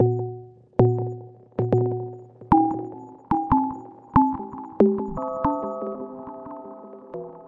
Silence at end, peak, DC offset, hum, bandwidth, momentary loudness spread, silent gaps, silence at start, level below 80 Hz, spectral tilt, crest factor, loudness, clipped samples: 0 s; -2 dBFS; under 0.1%; none; 3.9 kHz; 18 LU; none; 0 s; -46 dBFS; -11.5 dB/octave; 22 dB; -24 LUFS; under 0.1%